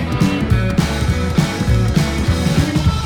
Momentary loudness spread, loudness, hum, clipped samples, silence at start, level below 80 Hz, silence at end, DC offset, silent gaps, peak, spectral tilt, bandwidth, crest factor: 2 LU; -16 LUFS; none; under 0.1%; 0 s; -24 dBFS; 0 s; under 0.1%; none; 0 dBFS; -6 dB/octave; 18.5 kHz; 14 dB